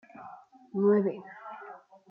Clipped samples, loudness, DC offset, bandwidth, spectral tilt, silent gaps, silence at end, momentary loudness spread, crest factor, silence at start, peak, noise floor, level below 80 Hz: under 0.1%; -28 LUFS; under 0.1%; 3.1 kHz; -11 dB/octave; none; 0.35 s; 23 LU; 18 dB; 0.15 s; -14 dBFS; -50 dBFS; -84 dBFS